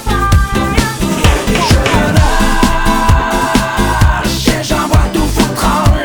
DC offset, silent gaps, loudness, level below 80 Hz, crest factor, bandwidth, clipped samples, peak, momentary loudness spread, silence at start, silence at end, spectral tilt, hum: under 0.1%; none; -12 LUFS; -16 dBFS; 10 dB; over 20 kHz; 0.3%; 0 dBFS; 3 LU; 0 s; 0 s; -5 dB/octave; none